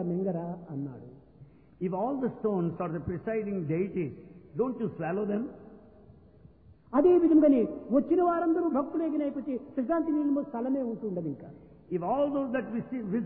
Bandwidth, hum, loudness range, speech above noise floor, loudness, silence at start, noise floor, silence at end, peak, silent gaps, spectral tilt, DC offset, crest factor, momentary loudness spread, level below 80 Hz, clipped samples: 3.5 kHz; none; 8 LU; 27 dB; -29 LUFS; 0 s; -56 dBFS; 0 s; -12 dBFS; none; -12 dB/octave; under 0.1%; 16 dB; 14 LU; -62 dBFS; under 0.1%